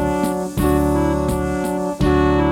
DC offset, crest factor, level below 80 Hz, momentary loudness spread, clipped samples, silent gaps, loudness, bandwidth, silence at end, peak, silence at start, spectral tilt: under 0.1%; 12 dB; -28 dBFS; 6 LU; under 0.1%; none; -19 LUFS; 18.5 kHz; 0 s; -4 dBFS; 0 s; -7 dB/octave